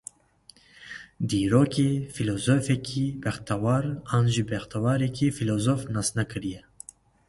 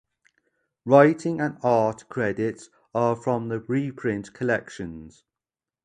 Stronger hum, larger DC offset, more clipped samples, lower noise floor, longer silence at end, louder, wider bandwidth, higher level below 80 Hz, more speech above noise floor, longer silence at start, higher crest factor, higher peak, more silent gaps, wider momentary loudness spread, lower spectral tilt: neither; neither; neither; second, -57 dBFS vs under -90 dBFS; about the same, 0.7 s vs 0.75 s; about the same, -26 LUFS vs -24 LUFS; first, 11.5 kHz vs 10 kHz; first, -52 dBFS vs -60 dBFS; second, 32 dB vs over 67 dB; about the same, 0.8 s vs 0.85 s; about the same, 20 dB vs 22 dB; second, -6 dBFS vs -2 dBFS; neither; about the same, 19 LU vs 19 LU; second, -6 dB/octave vs -7.5 dB/octave